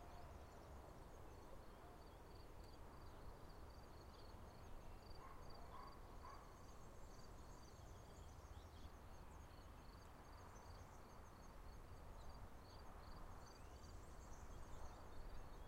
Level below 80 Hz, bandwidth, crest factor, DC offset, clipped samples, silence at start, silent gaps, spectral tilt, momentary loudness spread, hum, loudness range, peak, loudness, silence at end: -62 dBFS; 16 kHz; 14 dB; under 0.1%; under 0.1%; 0 s; none; -5 dB/octave; 2 LU; none; 1 LU; -42 dBFS; -61 LUFS; 0 s